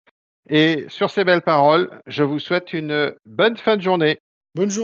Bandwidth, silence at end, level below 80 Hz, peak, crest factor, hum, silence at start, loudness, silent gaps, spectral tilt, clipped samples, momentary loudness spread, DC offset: 7.6 kHz; 0 s; -70 dBFS; -2 dBFS; 18 dB; none; 0.5 s; -19 LUFS; 4.20-4.41 s; -5 dB/octave; under 0.1%; 9 LU; under 0.1%